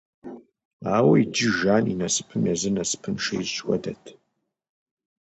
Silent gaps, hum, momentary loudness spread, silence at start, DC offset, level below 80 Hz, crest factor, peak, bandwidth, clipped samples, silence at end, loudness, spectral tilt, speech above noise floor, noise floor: 0.65-0.80 s; none; 19 LU; 0.25 s; under 0.1%; -58 dBFS; 18 dB; -6 dBFS; 9 kHz; under 0.1%; 1.1 s; -23 LUFS; -4.5 dB/octave; 53 dB; -76 dBFS